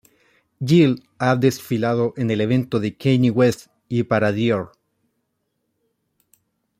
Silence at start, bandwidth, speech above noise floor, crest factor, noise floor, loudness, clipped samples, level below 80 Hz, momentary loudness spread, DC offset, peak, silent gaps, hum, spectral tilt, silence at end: 0.6 s; 15.5 kHz; 55 dB; 18 dB; -74 dBFS; -20 LUFS; under 0.1%; -60 dBFS; 9 LU; under 0.1%; -4 dBFS; none; none; -7 dB/octave; 2.1 s